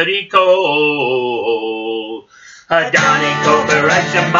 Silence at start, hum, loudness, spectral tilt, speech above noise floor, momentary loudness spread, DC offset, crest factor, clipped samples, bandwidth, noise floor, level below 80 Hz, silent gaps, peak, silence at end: 0 s; none; -13 LUFS; -4 dB/octave; 26 dB; 10 LU; under 0.1%; 14 dB; under 0.1%; 8 kHz; -39 dBFS; -60 dBFS; none; 0 dBFS; 0 s